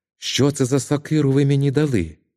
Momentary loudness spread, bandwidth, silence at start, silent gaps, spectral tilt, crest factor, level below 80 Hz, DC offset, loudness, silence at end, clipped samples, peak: 4 LU; 14 kHz; 0.2 s; none; -6 dB/octave; 16 dB; -48 dBFS; under 0.1%; -19 LUFS; 0.25 s; under 0.1%; -4 dBFS